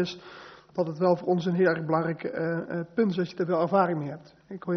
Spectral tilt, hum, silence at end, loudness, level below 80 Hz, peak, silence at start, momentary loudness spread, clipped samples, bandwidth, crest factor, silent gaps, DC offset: -6 dB/octave; none; 0 s; -27 LUFS; -68 dBFS; -8 dBFS; 0 s; 17 LU; under 0.1%; 6.4 kHz; 18 dB; none; under 0.1%